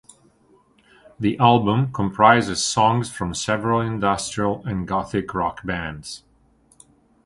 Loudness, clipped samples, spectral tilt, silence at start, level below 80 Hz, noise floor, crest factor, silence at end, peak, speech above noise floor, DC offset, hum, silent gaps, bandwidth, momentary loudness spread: -21 LUFS; under 0.1%; -5 dB/octave; 1.2 s; -48 dBFS; -58 dBFS; 22 dB; 1.1 s; 0 dBFS; 38 dB; under 0.1%; none; none; 11.5 kHz; 12 LU